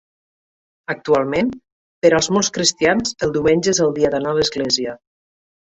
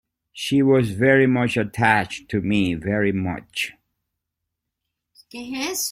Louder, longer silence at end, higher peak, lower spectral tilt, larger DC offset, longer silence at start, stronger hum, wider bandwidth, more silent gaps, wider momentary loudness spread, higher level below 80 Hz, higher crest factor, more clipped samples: first, -18 LUFS vs -21 LUFS; first, 0.8 s vs 0 s; about the same, -2 dBFS vs -2 dBFS; second, -3.5 dB/octave vs -5 dB/octave; neither; first, 0.9 s vs 0.35 s; neither; second, 8.4 kHz vs 16.5 kHz; first, 1.72-2.02 s vs none; second, 8 LU vs 12 LU; about the same, -50 dBFS vs -54 dBFS; about the same, 18 dB vs 20 dB; neither